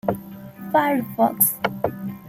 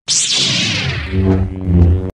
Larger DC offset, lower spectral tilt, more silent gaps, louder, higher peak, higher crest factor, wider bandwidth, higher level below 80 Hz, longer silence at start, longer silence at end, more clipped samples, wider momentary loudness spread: neither; about the same, -4.5 dB/octave vs -3.5 dB/octave; neither; second, -21 LUFS vs -14 LUFS; about the same, -2 dBFS vs 0 dBFS; first, 22 dB vs 14 dB; first, 16.5 kHz vs 11 kHz; second, -58 dBFS vs -24 dBFS; about the same, 0.05 s vs 0.1 s; about the same, 0 s vs 0.05 s; neither; first, 16 LU vs 6 LU